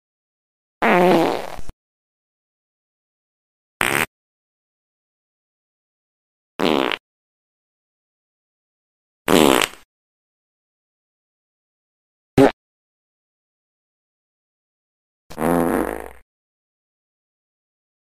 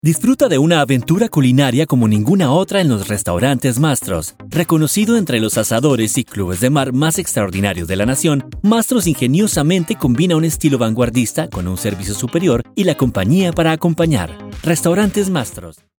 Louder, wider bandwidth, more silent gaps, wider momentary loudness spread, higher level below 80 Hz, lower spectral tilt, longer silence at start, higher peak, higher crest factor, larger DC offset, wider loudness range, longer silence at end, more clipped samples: second, -19 LUFS vs -15 LUFS; second, 15.5 kHz vs over 20 kHz; first, 1.73-3.80 s, 4.07-6.59 s, 7.00-9.25 s, 9.85-12.37 s, 12.53-15.30 s vs none; first, 19 LU vs 7 LU; second, -50 dBFS vs -38 dBFS; about the same, -4.5 dB/octave vs -5.5 dB/octave; first, 0.8 s vs 0.05 s; about the same, 0 dBFS vs 0 dBFS; first, 24 dB vs 14 dB; neither; first, 6 LU vs 2 LU; first, 1.95 s vs 0.3 s; neither